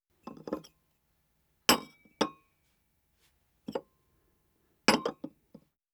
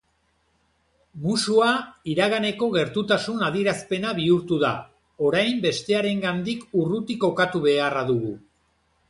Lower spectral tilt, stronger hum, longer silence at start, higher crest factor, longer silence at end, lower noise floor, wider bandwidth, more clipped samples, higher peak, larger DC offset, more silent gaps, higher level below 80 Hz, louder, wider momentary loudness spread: second, -2.5 dB/octave vs -5 dB/octave; neither; second, 0.25 s vs 1.15 s; first, 28 dB vs 18 dB; about the same, 0.65 s vs 0.7 s; first, -74 dBFS vs -68 dBFS; first, over 20 kHz vs 11.5 kHz; neither; about the same, -8 dBFS vs -6 dBFS; neither; neither; second, -68 dBFS vs -60 dBFS; second, -31 LUFS vs -23 LUFS; first, 22 LU vs 6 LU